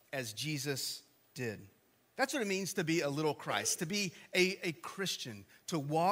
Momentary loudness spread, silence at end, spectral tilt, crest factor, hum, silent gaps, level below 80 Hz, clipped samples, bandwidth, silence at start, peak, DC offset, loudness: 12 LU; 0 s; -3.5 dB/octave; 20 dB; none; none; -80 dBFS; under 0.1%; 16 kHz; 0.1 s; -16 dBFS; under 0.1%; -36 LUFS